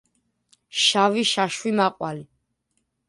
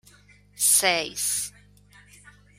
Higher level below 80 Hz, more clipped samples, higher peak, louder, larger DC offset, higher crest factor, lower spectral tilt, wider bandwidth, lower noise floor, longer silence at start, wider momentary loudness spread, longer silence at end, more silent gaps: second, -70 dBFS vs -62 dBFS; neither; about the same, -6 dBFS vs -6 dBFS; about the same, -21 LUFS vs -21 LUFS; neither; about the same, 20 dB vs 22 dB; first, -3 dB/octave vs 0.5 dB/octave; second, 11.5 kHz vs 16 kHz; first, -74 dBFS vs -55 dBFS; first, 0.75 s vs 0.55 s; first, 14 LU vs 10 LU; second, 0.85 s vs 1.1 s; neither